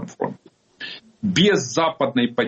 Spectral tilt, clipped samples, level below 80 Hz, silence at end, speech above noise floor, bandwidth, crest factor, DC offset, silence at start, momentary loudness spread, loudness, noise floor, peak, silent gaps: -4.5 dB/octave; under 0.1%; -60 dBFS; 0 s; 26 dB; 8.2 kHz; 16 dB; under 0.1%; 0 s; 17 LU; -20 LUFS; -45 dBFS; -6 dBFS; none